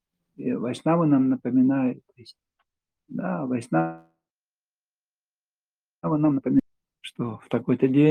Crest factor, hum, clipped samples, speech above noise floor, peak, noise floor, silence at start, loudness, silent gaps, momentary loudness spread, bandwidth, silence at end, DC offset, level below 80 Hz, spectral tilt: 18 dB; 50 Hz at -60 dBFS; under 0.1%; over 67 dB; -8 dBFS; under -90 dBFS; 0.4 s; -24 LUFS; none; 13 LU; 9.6 kHz; 0 s; under 0.1%; -64 dBFS; -8.5 dB/octave